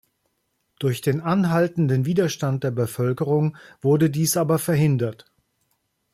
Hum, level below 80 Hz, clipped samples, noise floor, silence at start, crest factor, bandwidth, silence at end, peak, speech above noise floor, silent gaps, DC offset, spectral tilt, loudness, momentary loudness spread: none; -60 dBFS; under 0.1%; -73 dBFS; 0.8 s; 14 dB; 15.5 kHz; 1 s; -10 dBFS; 52 dB; none; under 0.1%; -6.5 dB/octave; -22 LUFS; 6 LU